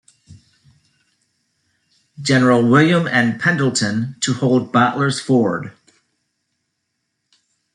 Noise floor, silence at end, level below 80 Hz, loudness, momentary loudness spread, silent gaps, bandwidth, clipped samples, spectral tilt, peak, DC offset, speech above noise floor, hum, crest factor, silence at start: -74 dBFS; 2.05 s; -60 dBFS; -16 LUFS; 9 LU; none; 11 kHz; under 0.1%; -5 dB/octave; -2 dBFS; under 0.1%; 58 dB; none; 18 dB; 0.3 s